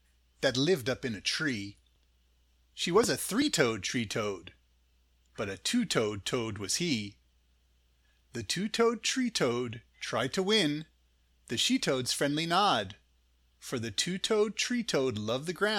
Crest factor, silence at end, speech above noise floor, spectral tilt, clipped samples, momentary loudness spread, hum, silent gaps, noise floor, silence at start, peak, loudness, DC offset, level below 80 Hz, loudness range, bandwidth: 22 dB; 0 s; 38 dB; -3.5 dB/octave; under 0.1%; 12 LU; none; none; -68 dBFS; 0.4 s; -10 dBFS; -30 LUFS; under 0.1%; -64 dBFS; 4 LU; 18 kHz